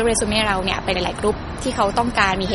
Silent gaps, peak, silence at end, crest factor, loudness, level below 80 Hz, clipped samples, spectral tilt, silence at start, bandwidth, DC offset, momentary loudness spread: none; -2 dBFS; 0 s; 18 dB; -20 LUFS; -34 dBFS; under 0.1%; -3.5 dB/octave; 0 s; 11.5 kHz; under 0.1%; 5 LU